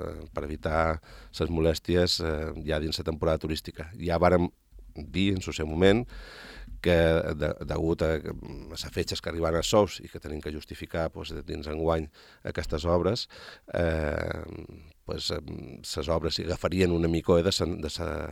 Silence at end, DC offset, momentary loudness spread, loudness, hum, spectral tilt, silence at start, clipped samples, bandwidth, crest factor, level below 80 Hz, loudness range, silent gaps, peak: 0 s; under 0.1%; 16 LU; -28 LUFS; none; -5.5 dB/octave; 0 s; under 0.1%; 16 kHz; 22 dB; -44 dBFS; 4 LU; none; -6 dBFS